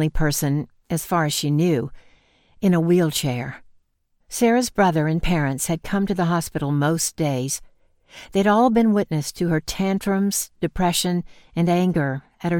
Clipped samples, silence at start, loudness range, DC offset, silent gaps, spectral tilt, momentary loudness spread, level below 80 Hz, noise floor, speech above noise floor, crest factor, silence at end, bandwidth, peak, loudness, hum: under 0.1%; 0 s; 2 LU; under 0.1%; none; -5 dB/octave; 9 LU; -38 dBFS; -66 dBFS; 46 dB; 16 dB; 0 s; 17.5 kHz; -6 dBFS; -21 LUFS; none